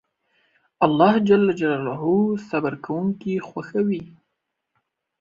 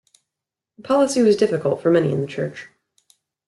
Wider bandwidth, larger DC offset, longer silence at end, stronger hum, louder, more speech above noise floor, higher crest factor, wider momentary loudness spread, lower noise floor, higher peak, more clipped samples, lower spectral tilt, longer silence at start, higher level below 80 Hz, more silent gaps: second, 7.2 kHz vs 12 kHz; neither; first, 1.15 s vs 0.8 s; neither; about the same, -21 LUFS vs -19 LUFS; second, 58 dB vs 67 dB; about the same, 20 dB vs 16 dB; about the same, 10 LU vs 12 LU; second, -79 dBFS vs -85 dBFS; about the same, -2 dBFS vs -4 dBFS; neither; first, -8 dB/octave vs -6 dB/octave; about the same, 0.8 s vs 0.85 s; about the same, -62 dBFS vs -66 dBFS; neither